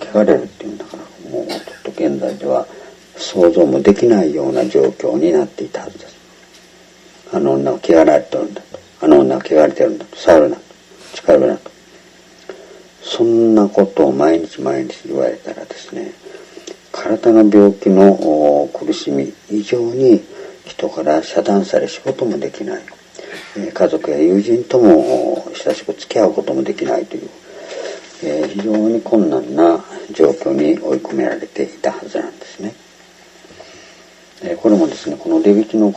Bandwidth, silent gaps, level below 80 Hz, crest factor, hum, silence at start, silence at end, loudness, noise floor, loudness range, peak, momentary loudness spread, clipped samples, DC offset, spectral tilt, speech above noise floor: 8.6 kHz; none; -54 dBFS; 16 dB; none; 0 s; 0 s; -14 LUFS; -44 dBFS; 7 LU; 0 dBFS; 19 LU; under 0.1%; under 0.1%; -6.5 dB/octave; 30 dB